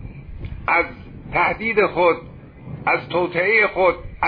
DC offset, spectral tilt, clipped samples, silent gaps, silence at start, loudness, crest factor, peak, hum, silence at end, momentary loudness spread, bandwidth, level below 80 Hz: under 0.1%; -8.5 dB/octave; under 0.1%; none; 0 s; -19 LUFS; 16 dB; -4 dBFS; none; 0 s; 20 LU; 5.2 kHz; -40 dBFS